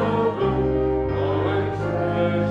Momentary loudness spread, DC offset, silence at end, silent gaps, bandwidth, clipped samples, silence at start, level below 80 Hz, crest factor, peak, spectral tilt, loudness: 2 LU; under 0.1%; 0 s; none; 7.4 kHz; under 0.1%; 0 s; -36 dBFS; 12 dB; -10 dBFS; -9 dB/octave; -22 LUFS